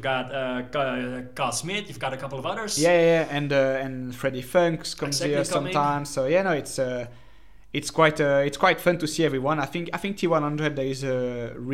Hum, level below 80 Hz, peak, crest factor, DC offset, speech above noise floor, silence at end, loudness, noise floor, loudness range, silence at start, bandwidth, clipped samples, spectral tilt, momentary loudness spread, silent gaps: none; -54 dBFS; -4 dBFS; 20 dB; 0.5%; 28 dB; 0 s; -25 LUFS; -53 dBFS; 2 LU; 0 s; 16 kHz; under 0.1%; -4.5 dB/octave; 10 LU; none